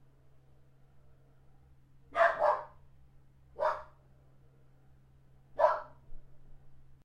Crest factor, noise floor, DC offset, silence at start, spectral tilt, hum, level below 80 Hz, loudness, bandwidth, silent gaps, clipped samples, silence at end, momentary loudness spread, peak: 26 dB; -61 dBFS; under 0.1%; 2.1 s; -4.5 dB/octave; none; -60 dBFS; -31 LUFS; 9 kHz; none; under 0.1%; 0.1 s; 26 LU; -12 dBFS